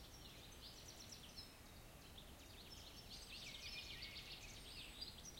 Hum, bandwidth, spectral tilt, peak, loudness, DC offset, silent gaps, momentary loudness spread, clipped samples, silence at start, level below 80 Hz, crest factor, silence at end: none; 16.5 kHz; -2 dB/octave; -38 dBFS; -55 LUFS; under 0.1%; none; 8 LU; under 0.1%; 0 s; -64 dBFS; 18 dB; 0 s